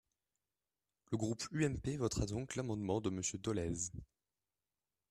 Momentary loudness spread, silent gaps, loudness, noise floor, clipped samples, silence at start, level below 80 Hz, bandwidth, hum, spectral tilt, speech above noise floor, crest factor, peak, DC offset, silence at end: 5 LU; none; -40 LUFS; under -90 dBFS; under 0.1%; 1.1 s; -58 dBFS; 13.5 kHz; none; -5 dB/octave; over 51 dB; 18 dB; -22 dBFS; under 0.1%; 1.05 s